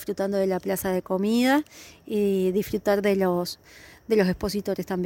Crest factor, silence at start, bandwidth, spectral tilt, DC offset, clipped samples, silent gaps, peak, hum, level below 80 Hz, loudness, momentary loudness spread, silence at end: 16 dB; 0 s; 17 kHz; -6 dB/octave; under 0.1%; under 0.1%; none; -8 dBFS; none; -52 dBFS; -25 LUFS; 10 LU; 0 s